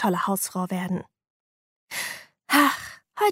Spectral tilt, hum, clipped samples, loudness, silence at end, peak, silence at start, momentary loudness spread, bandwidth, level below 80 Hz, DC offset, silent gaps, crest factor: -4 dB/octave; none; under 0.1%; -25 LUFS; 0 s; -4 dBFS; 0 s; 15 LU; 16 kHz; -70 dBFS; under 0.1%; 1.30-1.88 s; 22 dB